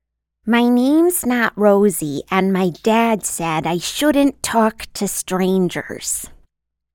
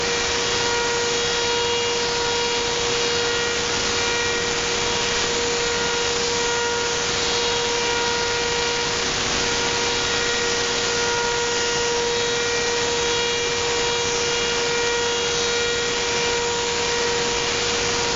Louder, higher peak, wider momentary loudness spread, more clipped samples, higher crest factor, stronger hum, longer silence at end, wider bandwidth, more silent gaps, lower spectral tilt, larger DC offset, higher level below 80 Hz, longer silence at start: first, -17 LUFS vs -20 LUFS; first, 0 dBFS vs -6 dBFS; first, 9 LU vs 1 LU; neither; about the same, 16 dB vs 16 dB; neither; first, 0.6 s vs 0 s; first, 18 kHz vs 8 kHz; neither; first, -4.5 dB/octave vs -0.5 dB/octave; neither; second, -50 dBFS vs -44 dBFS; first, 0.45 s vs 0 s